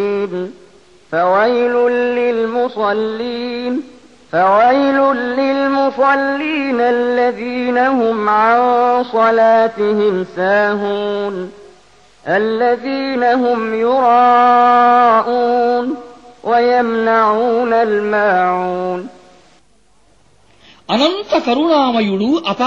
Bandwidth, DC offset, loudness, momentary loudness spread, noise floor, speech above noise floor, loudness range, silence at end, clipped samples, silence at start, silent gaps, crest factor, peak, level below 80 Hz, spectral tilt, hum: 7.6 kHz; 0.3%; -14 LUFS; 10 LU; -55 dBFS; 41 dB; 6 LU; 0 s; under 0.1%; 0 s; none; 14 dB; -2 dBFS; -58 dBFS; -6 dB/octave; none